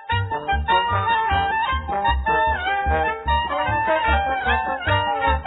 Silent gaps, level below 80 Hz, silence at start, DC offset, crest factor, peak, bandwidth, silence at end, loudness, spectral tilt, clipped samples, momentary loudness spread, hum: none; -30 dBFS; 0 s; under 0.1%; 14 dB; -6 dBFS; 4.1 kHz; 0 s; -21 LUFS; -8.5 dB/octave; under 0.1%; 3 LU; none